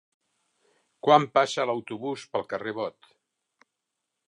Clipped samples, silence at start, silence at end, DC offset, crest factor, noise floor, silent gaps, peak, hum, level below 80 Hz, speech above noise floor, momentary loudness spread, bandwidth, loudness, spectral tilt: under 0.1%; 1.05 s; 1.4 s; under 0.1%; 24 dB; -83 dBFS; none; -4 dBFS; none; -78 dBFS; 58 dB; 14 LU; 11 kHz; -26 LUFS; -4.5 dB/octave